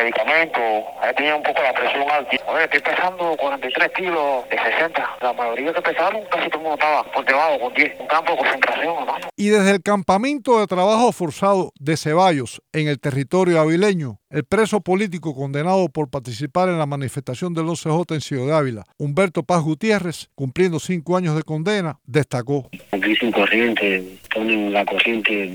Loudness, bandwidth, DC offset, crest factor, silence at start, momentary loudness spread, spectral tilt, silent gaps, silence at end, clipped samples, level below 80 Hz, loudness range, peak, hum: -19 LUFS; over 20 kHz; under 0.1%; 20 dB; 0 s; 8 LU; -5.5 dB/octave; none; 0 s; under 0.1%; -58 dBFS; 4 LU; 0 dBFS; none